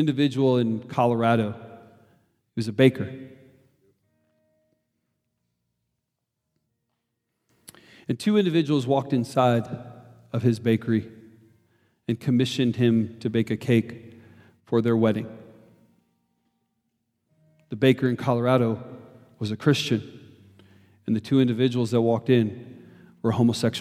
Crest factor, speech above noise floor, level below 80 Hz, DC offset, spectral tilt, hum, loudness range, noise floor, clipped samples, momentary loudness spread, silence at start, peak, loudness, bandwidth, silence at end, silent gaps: 22 dB; 59 dB; -70 dBFS; under 0.1%; -7 dB/octave; none; 5 LU; -81 dBFS; under 0.1%; 17 LU; 0 s; -4 dBFS; -24 LUFS; 14.5 kHz; 0 s; none